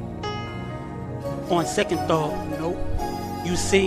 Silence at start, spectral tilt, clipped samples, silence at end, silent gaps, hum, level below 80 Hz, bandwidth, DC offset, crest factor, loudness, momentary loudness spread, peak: 0 s; -5 dB/octave; under 0.1%; 0 s; none; none; -38 dBFS; 15.5 kHz; under 0.1%; 18 dB; -26 LUFS; 10 LU; -6 dBFS